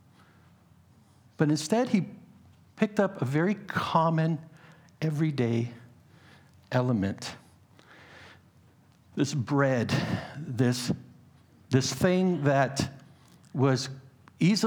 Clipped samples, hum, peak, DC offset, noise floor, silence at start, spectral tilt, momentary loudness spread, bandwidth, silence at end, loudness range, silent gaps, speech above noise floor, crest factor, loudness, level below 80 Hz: under 0.1%; none; -8 dBFS; under 0.1%; -59 dBFS; 1.4 s; -6 dB/octave; 13 LU; 19.5 kHz; 0 s; 5 LU; none; 33 dB; 20 dB; -28 LUFS; -64 dBFS